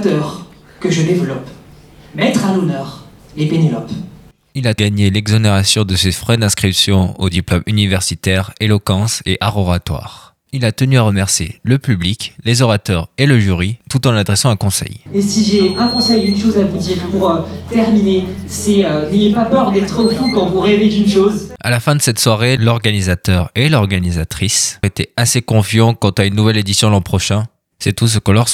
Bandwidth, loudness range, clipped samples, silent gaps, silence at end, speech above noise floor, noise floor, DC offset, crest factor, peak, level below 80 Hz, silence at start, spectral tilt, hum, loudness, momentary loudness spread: 16 kHz; 3 LU; under 0.1%; none; 0 s; 27 dB; -40 dBFS; under 0.1%; 14 dB; 0 dBFS; -38 dBFS; 0 s; -5 dB/octave; none; -14 LUFS; 8 LU